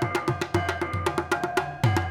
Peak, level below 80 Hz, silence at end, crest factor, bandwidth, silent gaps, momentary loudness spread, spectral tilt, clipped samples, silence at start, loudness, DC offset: -6 dBFS; -48 dBFS; 0 s; 20 dB; 17 kHz; none; 3 LU; -6 dB/octave; under 0.1%; 0 s; -27 LUFS; under 0.1%